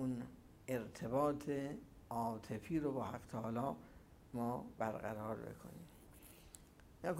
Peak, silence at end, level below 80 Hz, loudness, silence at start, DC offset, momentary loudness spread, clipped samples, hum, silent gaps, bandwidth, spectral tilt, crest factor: -24 dBFS; 0 s; -66 dBFS; -43 LUFS; 0 s; under 0.1%; 21 LU; under 0.1%; none; none; 16 kHz; -7 dB/octave; 20 dB